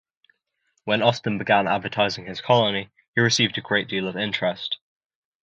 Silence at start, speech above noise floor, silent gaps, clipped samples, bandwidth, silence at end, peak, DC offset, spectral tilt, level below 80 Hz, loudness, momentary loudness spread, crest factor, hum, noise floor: 0.85 s; 50 dB; 3.08-3.13 s; under 0.1%; 9 kHz; 0.65 s; -4 dBFS; under 0.1%; -4 dB/octave; -62 dBFS; -22 LUFS; 10 LU; 20 dB; none; -73 dBFS